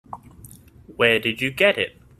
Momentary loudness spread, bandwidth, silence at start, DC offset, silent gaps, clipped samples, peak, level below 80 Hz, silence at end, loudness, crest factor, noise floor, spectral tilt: 19 LU; 15 kHz; 0.1 s; under 0.1%; none; under 0.1%; -2 dBFS; -54 dBFS; 0.3 s; -20 LUFS; 22 dB; -46 dBFS; -4 dB/octave